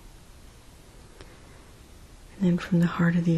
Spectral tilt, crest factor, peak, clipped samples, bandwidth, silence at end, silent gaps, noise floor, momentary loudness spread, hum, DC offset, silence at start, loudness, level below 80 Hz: -8 dB/octave; 16 dB; -12 dBFS; under 0.1%; 12 kHz; 0 s; none; -50 dBFS; 26 LU; none; under 0.1%; 0.05 s; -25 LUFS; -50 dBFS